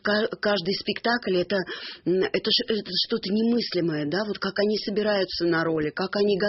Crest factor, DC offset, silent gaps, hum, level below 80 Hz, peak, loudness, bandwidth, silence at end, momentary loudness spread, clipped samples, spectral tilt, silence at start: 16 dB; under 0.1%; none; none; -60 dBFS; -10 dBFS; -25 LUFS; 6 kHz; 0 s; 4 LU; under 0.1%; -3 dB/octave; 0.05 s